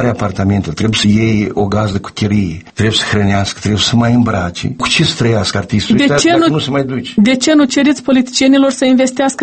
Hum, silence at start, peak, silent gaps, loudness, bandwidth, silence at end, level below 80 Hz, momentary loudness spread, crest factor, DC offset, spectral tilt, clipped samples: none; 0 s; 0 dBFS; none; -12 LUFS; 8.8 kHz; 0 s; -38 dBFS; 6 LU; 12 dB; under 0.1%; -5 dB/octave; under 0.1%